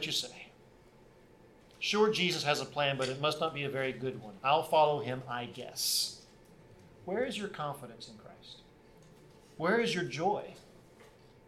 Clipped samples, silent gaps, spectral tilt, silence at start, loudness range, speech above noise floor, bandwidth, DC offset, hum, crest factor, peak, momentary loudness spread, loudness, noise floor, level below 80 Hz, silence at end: under 0.1%; none; -3.5 dB/octave; 0 s; 7 LU; 27 dB; 16.5 kHz; under 0.1%; none; 20 dB; -14 dBFS; 22 LU; -32 LUFS; -59 dBFS; -68 dBFS; 0.4 s